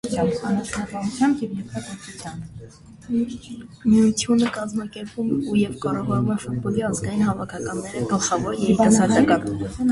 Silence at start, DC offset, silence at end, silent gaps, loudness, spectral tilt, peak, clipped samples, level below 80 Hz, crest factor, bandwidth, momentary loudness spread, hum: 0.05 s; under 0.1%; 0 s; none; -22 LUFS; -5.5 dB/octave; -4 dBFS; under 0.1%; -48 dBFS; 18 dB; 11.5 kHz; 17 LU; none